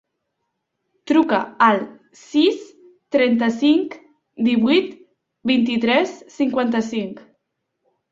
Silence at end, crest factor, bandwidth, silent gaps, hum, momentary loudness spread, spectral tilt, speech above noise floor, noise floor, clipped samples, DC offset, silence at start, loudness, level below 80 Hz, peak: 0.9 s; 18 dB; 7.6 kHz; none; none; 11 LU; -5.5 dB/octave; 58 dB; -76 dBFS; under 0.1%; under 0.1%; 1.05 s; -19 LUFS; -64 dBFS; -2 dBFS